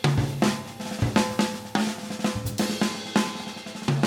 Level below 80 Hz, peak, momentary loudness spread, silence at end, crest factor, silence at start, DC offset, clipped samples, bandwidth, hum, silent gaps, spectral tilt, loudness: -48 dBFS; -6 dBFS; 8 LU; 0 s; 20 dB; 0 s; under 0.1%; under 0.1%; 17 kHz; none; none; -5 dB/octave; -27 LUFS